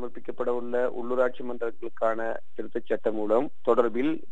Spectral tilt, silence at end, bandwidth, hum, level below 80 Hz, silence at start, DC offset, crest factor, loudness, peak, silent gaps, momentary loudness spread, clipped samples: -7.5 dB/octave; 0.1 s; 8 kHz; none; -70 dBFS; 0 s; 3%; 20 dB; -28 LUFS; -8 dBFS; none; 10 LU; under 0.1%